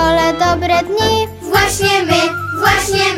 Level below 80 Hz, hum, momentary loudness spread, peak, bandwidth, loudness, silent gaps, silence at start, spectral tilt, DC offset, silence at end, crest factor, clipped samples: -34 dBFS; none; 3 LU; 0 dBFS; 16.5 kHz; -13 LUFS; none; 0 s; -3.5 dB/octave; under 0.1%; 0 s; 14 dB; under 0.1%